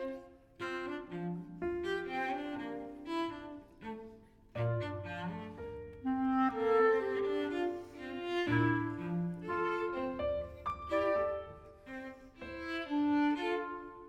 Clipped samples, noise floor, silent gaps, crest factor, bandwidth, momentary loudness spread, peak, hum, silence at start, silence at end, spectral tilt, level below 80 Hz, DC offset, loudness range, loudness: under 0.1%; -56 dBFS; none; 18 dB; 10 kHz; 16 LU; -18 dBFS; none; 0 s; 0 s; -7.5 dB/octave; -60 dBFS; under 0.1%; 7 LU; -36 LUFS